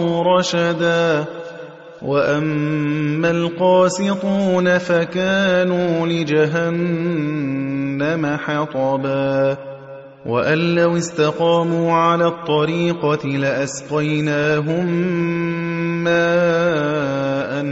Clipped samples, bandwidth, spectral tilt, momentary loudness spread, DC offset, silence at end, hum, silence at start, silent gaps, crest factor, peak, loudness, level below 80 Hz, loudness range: under 0.1%; 8.2 kHz; -6 dB/octave; 6 LU; under 0.1%; 0 s; none; 0 s; none; 14 dB; -4 dBFS; -18 LUFS; -58 dBFS; 3 LU